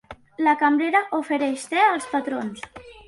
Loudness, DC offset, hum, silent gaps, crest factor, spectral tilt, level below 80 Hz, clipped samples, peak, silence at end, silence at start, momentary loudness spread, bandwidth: -22 LUFS; under 0.1%; none; none; 16 dB; -3.5 dB/octave; -60 dBFS; under 0.1%; -6 dBFS; 0.1 s; 0.1 s; 16 LU; 11.5 kHz